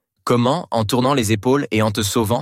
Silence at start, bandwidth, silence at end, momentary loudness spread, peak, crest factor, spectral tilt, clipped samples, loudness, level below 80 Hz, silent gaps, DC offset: 0.25 s; 16.5 kHz; 0 s; 2 LU; -4 dBFS; 14 dB; -5 dB/octave; under 0.1%; -18 LUFS; -52 dBFS; none; under 0.1%